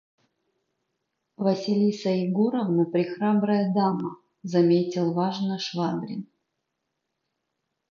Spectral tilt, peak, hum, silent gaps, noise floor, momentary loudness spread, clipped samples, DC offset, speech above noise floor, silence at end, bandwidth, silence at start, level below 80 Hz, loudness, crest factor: -7.5 dB/octave; -10 dBFS; none; none; -80 dBFS; 9 LU; under 0.1%; under 0.1%; 57 dB; 1.65 s; 7.2 kHz; 1.4 s; -78 dBFS; -25 LUFS; 18 dB